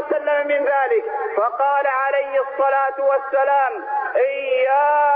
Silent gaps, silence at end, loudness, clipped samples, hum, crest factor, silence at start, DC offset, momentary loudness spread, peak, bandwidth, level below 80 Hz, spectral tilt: none; 0 s; -19 LUFS; under 0.1%; none; 10 dB; 0 s; under 0.1%; 5 LU; -8 dBFS; 4.7 kHz; -68 dBFS; -5.5 dB/octave